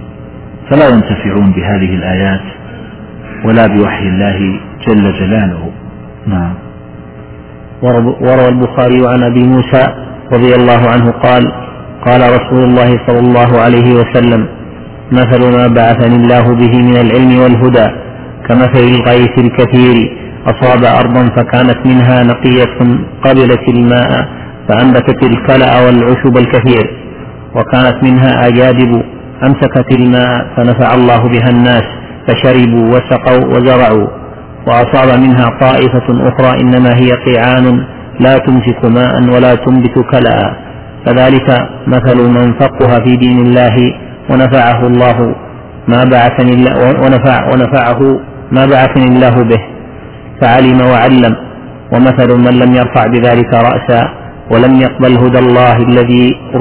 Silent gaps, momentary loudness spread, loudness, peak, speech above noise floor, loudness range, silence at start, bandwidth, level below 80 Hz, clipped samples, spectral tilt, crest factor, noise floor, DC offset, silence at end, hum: none; 11 LU; -7 LUFS; 0 dBFS; 22 dB; 4 LU; 0 s; 4 kHz; -32 dBFS; 3%; -11 dB/octave; 8 dB; -28 dBFS; 1%; 0 s; none